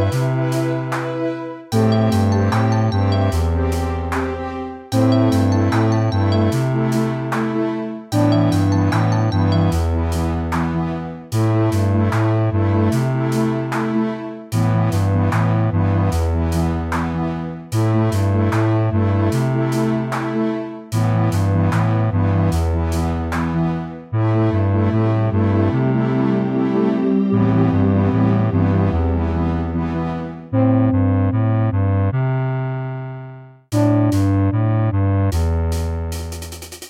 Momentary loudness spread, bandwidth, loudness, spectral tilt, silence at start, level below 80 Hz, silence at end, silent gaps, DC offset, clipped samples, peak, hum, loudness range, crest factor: 7 LU; 14.5 kHz; -18 LUFS; -8 dB/octave; 0 s; -36 dBFS; 0 s; none; under 0.1%; under 0.1%; -4 dBFS; none; 2 LU; 12 dB